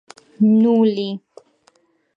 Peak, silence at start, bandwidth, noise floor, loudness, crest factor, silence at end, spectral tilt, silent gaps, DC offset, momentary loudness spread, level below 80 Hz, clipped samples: -6 dBFS; 0.4 s; 5.4 kHz; -59 dBFS; -17 LUFS; 14 dB; 1 s; -8.5 dB/octave; none; under 0.1%; 14 LU; -72 dBFS; under 0.1%